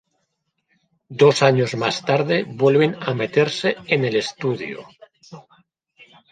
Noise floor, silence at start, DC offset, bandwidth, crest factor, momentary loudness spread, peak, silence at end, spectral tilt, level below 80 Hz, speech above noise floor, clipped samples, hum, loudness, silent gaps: -73 dBFS; 1.1 s; under 0.1%; 9.4 kHz; 18 dB; 9 LU; -2 dBFS; 0.9 s; -5.5 dB/octave; -64 dBFS; 54 dB; under 0.1%; none; -19 LUFS; none